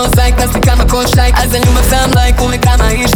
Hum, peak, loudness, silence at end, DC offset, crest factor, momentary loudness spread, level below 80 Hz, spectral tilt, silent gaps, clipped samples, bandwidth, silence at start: none; 0 dBFS; -10 LUFS; 0 s; under 0.1%; 8 dB; 1 LU; -12 dBFS; -4.5 dB/octave; none; under 0.1%; 19.5 kHz; 0 s